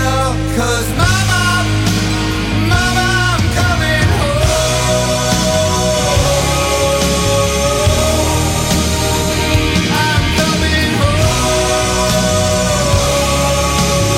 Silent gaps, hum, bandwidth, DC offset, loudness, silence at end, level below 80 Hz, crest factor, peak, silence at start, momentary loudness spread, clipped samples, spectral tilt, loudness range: none; none; 16.5 kHz; under 0.1%; -13 LUFS; 0 s; -22 dBFS; 12 dB; -2 dBFS; 0 s; 2 LU; under 0.1%; -4 dB/octave; 1 LU